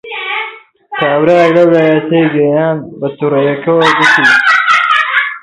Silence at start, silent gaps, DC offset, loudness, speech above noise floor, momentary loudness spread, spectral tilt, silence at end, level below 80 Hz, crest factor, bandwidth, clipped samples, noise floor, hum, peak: 0.05 s; none; under 0.1%; -9 LUFS; 20 dB; 11 LU; -5.5 dB/octave; 0.05 s; -56 dBFS; 10 dB; 11.5 kHz; under 0.1%; -30 dBFS; none; 0 dBFS